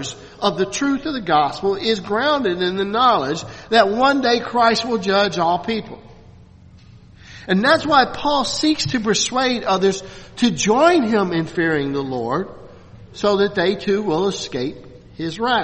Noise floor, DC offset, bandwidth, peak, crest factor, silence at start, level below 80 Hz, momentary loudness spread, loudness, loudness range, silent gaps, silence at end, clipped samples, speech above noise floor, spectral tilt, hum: -45 dBFS; under 0.1%; 8.8 kHz; 0 dBFS; 18 dB; 0 s; -50 dBFS; 10 LU; -18 LUFS; 4 LU; none; 0 s; under 0.1%; 27 dB; -4 dB/octave; none